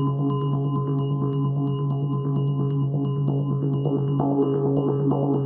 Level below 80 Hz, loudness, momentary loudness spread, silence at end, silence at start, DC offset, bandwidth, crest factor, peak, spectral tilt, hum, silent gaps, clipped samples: -58 dBFS; -24 LUFS; 3 LU; 0 s; 0 s; under 0.1%; 3 kHz; 12 dB; -10 dBFS; -11 dB/octave; none; none; under 0.1%